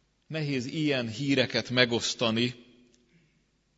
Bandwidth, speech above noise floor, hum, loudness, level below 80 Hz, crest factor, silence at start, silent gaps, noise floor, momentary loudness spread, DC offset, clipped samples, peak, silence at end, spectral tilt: 8 kHz; 42 dB; none; -28 LUFS; -68 dBFS; 24 dB; 0.3 s; none; -70 dBFS; 7 LU; under 0.1%; under 0.1%; -6 dBFS; 1.15 s; -4.5 dB/octave